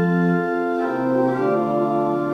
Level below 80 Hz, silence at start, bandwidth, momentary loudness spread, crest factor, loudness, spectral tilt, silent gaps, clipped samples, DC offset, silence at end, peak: -66 dBFS; 0 s; 6.4 kHz; 3 LU; 12 dB; -20 LUFS; -9 dB/octave; none; under 0.1%; under 0.1%; 0 s; -8 dBFS